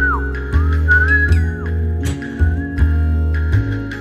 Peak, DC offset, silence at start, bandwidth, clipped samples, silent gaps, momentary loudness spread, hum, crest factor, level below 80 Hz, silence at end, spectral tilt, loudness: -2 dBFS; under 0.1%; 0 s; 8.4 kHz; under 0.1%; none; 8 LU; none; 14 dB; -18 dBFS; 0 s; -7.5 dB/octave; -17 LUFS